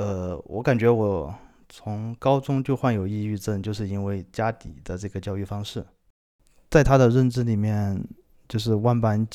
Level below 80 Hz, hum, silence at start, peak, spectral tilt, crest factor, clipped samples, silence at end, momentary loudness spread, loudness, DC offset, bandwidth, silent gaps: -42 dBFS; none; 0 s; -2 dBFS; -7.5 dB/octave; 22 dB; under 0.1%; 0 s; 15 LU; -24 LUFS; under 0.1%; 14 kHz; 6.10-6.39 s